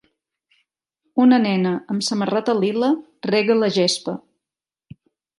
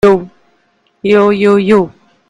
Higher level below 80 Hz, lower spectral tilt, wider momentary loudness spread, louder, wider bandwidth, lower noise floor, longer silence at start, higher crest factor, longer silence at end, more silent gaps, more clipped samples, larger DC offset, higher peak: second, -70 dBFS vs -46 dBFS; second, -5 dB/octave vs -7.5 dB/octave; about the same, 10 LU vs 10 LU; second, -19 LUFS vs -11 LUFS; first, 11.5 kHz vs 10 kHz; first, -89 dBFS vs -56 dBFS; first, 1.15 s vs 0.05 s; first, 18 dB vs 12 dB; first, 1.2 s vs 0.4 s; neither; second, under 0.1% vs 0.2%; neither; second, -4 dBFS vs 0 dBFS